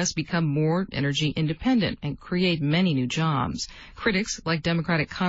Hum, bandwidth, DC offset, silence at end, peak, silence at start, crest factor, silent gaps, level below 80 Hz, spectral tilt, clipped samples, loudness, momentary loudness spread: none; 8 kHz; under 0.1%; 0 s; -10 dBFS; 0 s; 16 dB; none; -48 dBFS; -5 dB/octave; under 0.1%; -25 LUFS; 6 LU